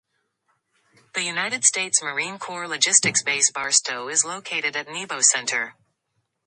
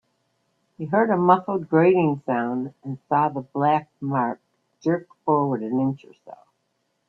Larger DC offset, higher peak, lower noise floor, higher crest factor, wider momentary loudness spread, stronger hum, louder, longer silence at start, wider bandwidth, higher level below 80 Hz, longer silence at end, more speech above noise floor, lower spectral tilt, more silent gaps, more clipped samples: neither; first, 0 dBFS vs -4 dBFS; about the same, -75 dBFS vs -73 dBFS; about the same, 24 dB vs 20 dB; about the same, 12 LU vs 11 LU; neither; first, -20 LUFS vs -23 LUFS; first, 1.15 s vs 0.8 s; first, 11.5 kHz vs 6.2 kHz; second, -74 dBFS vs -68 dBFS; about the same, 0.75 s vs 0.75 s; about the same, 51 dB vs 51 dB; second, 0.5 dB/octave vs -9.5 dB/octave; neither; neither